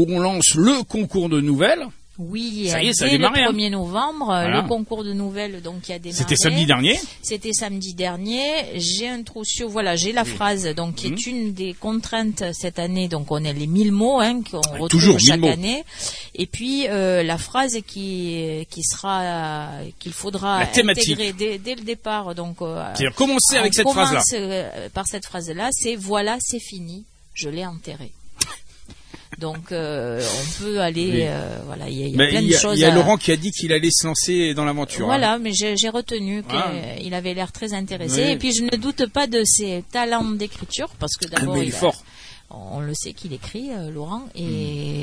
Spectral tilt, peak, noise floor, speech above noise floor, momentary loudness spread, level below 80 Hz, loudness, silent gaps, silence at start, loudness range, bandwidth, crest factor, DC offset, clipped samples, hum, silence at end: -3.5 dB/octave; 0 dBFS; -42 dBFS; 21 dB; 15 LU; -46 dBFS; -20 LUFS; none; 0 s; 8 LU; 11 kHz; 22 dB; under 0.1%; under 0.1%; none; 0 s